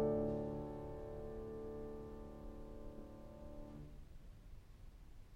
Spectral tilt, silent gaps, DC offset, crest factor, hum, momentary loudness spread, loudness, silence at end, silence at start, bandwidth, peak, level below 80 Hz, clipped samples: -9 dB/octave; none; under 0.1%; 18 dB; none; 19 LU; -48 LUFS; 0 s; 0 s; 16 kHz; -28 dBFS; -56 dBFS; under 0.1%